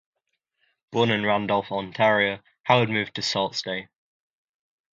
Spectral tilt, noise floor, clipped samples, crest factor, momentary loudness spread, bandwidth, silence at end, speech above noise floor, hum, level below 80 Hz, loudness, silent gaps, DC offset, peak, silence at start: -5 dB/octave; -79 dBFS; under 0.1%; 22 dB; 11 LU; 9 kHz; 1.1 s; 55 dB; none; -64 dBFS; -24 LUFS; 2.60-2.64 s; under 0.1%; -4 dBFS; 0.9 s